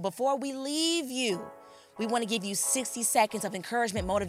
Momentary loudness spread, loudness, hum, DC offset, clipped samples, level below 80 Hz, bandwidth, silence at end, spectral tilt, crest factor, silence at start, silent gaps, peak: 7 LU; -29 LUFS; none; under 0.1%; under 0.1%; -54 dBFS; 16.5 kHz; 0 s; -2.5 dB/octave; 18 dB; 0 s; none; -12 dBFS